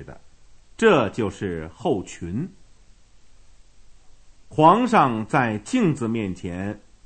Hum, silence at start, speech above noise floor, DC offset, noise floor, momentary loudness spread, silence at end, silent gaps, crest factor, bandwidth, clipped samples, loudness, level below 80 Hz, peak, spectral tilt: none; 0 s; 29 dB; under 0.1%; -50 dBFS; 15 LU; 0.3 s; none; 20 dB; 9.2 kHz; under 0.1%; -22 LUFS; -52 dBFS; -2 dBFS; -6.5 dB/octave